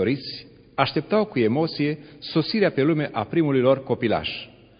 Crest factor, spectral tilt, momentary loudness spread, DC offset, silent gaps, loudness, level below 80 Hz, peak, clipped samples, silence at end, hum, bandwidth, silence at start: 20 dB; -11 dB/octave; 12 LU; under 0.1%; none; -23 LUFS; -56 dBFS; -4 dBFS; under 0.1%; 0.3 s; none; 5.2 kHz; 0 s